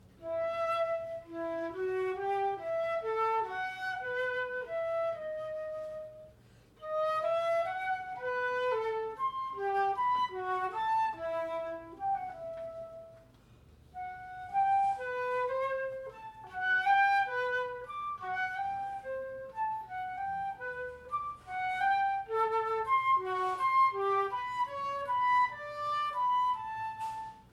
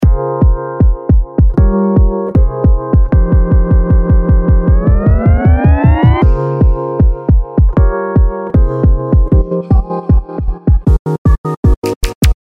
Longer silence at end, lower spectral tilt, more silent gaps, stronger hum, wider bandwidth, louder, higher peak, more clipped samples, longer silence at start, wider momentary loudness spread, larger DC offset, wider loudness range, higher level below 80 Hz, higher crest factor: about the same, 0.1 s vs 0.1 s; second, -4.5 dB/octave vs -8.5 dB/octave; second, none vs 10.99-11.05 s, 11.18-11.25 s, 11.38-11.44 s, 11.57-11.63 s, 11.77-11.82 s, 11.96-12.01 s, 12.15-12.21 s; neither; first, 13 kHz vs 11 kHz; second, -33 LUFS vs -12 LUFS; second, -16 dBFS vs 0 dBFS; neither; first, 0.2 s vs 0 s; first, 13 LU vs 4 LU; neither; first, 7 LU vs 3 LU; second, -68 dBFS vs -12 dBFS; first, 16 dB vs 10 dB